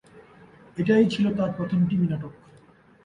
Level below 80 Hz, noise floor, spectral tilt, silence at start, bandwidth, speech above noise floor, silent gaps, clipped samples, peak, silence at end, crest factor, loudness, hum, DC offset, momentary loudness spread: -58 dBFS; -55 dBFS; -8 dB/octave; 0.15 s; 10 kHz; 32 dB; none; under 0.1%; -8 dBFS; 0.7 s; 16 dB; -24 LUFS; none; under 0.1%; 14 LU